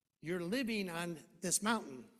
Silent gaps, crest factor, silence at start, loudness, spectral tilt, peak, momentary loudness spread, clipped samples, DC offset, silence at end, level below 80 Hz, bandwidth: none; 22 dB; 0.25 s; -38 LUFS; -3 dB/octave; -18 dBFS; 9 LU; under 0.1%; under 0.1%; 0.1 s; -74 dBFS; 15 kHz